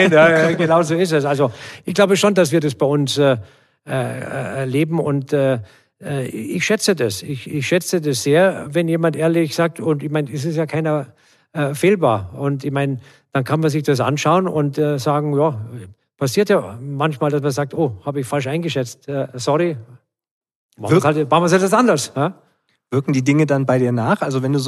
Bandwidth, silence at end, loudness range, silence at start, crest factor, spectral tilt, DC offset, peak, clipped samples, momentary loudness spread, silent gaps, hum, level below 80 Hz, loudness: 13.5 kHz; 0 s; 4 LU; 0 s; 16 dB; -5.5 dB/octave; under 0.1%; -2 dBFS; under 0.1%; 10 LU; 20.31-20.41 s, 20.55-20.69 s; none; -62 dBFS; -18 LUFS